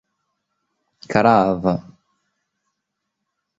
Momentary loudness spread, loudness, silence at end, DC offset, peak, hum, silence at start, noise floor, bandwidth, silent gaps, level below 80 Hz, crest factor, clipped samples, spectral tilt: 9 LU; -18 LUFS; 1.8 s; under 0.1%; -2 dBFS; 50 Hz at -50 dBFS; 1.1 s; -78 dBFS; 7.8 kHz; none; -52 dBFS; 22 dB; under 0.1%; -7.5 dB/octave